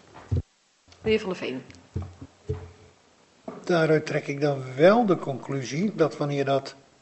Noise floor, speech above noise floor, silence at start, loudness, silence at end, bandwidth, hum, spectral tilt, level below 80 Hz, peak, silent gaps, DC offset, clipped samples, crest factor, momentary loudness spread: -61 dBFS; 37 dB; 0.15 s; -25 LUFS; 0.3 s; 8.2 kHz; none; -6.5 dB/octave; -52 dBFS; -6 dBFS; none; under 0.1%; under 0.1%; 20 dB; 18 LU